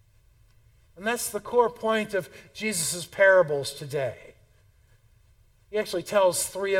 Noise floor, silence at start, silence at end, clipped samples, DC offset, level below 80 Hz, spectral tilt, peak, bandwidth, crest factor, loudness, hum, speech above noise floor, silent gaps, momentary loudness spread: -60 dBFS; 1 s; 0 s; under 0.1%; under 0.1%; -60 dBFS; -3 dB/octave; -8 dBFS; 17.5 kHz; 20 dB; -25 LUFS; none; 34 dB; none; 13 LU